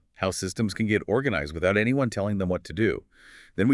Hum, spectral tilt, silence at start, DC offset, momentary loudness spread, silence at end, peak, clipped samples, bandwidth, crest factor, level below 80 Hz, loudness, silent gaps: none; -6 dB/octave; 0.2 s; under 0.1%; 6 LU; 0 s; -10 dBFS; under 0.1%; 12 kHz; 16 dB; -52 dBFS; -26 LUFS; none